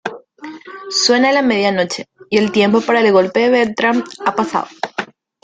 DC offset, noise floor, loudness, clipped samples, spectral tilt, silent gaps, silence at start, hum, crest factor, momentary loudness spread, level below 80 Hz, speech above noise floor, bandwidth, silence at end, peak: under 0.1%; -34 dBFS; -15 LUFS; under 0.1%; -4 dB/octave; none; 0.05 s; none; 14 dB; 20 LU; -60 dBFS; 20 dB; 9.4 kHz; 0.4 s; -2 dBFS